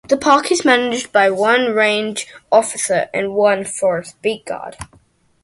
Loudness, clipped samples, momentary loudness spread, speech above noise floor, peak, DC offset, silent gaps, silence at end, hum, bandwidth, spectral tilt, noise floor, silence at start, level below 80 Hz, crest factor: -16 LUFS; under 0.1%; 14 LU; 37 dB; 0 dBFS; under 0.1%; none; 0.6 s; none; 11.5 kHz; -3 dB/octave; -54 dBFS; 0.1 s; -54 dBFS; 16 dB